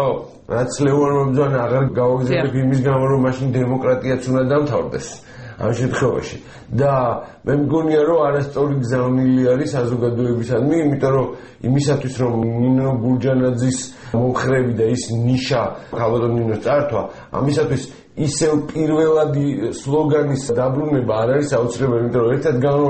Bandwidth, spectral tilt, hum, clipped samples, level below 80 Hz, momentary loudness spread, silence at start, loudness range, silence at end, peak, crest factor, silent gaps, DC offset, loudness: 8.8 kHz; -7 dB/octave; none; under 0.1%; -46 dBFS; 8 LU; 0 s; 2 LU; 0 s; -6 dBFS; 12 dB; none; under 0.1%; -18 LUFS